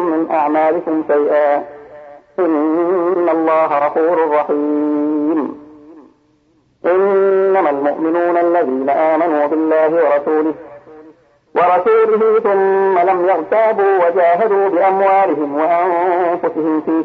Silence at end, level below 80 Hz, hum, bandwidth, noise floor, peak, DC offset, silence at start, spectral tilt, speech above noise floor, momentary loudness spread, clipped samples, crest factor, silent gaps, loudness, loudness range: 0 s; -64 dBFS; none; 5 kHz; -56 dBFS; -2 dBFS; under 0.1%; 0 s; -8.5 dB/octave; 43 dB; 5 LU; under 0.1%; 12 dB; none; -14 LUFS; 4 LU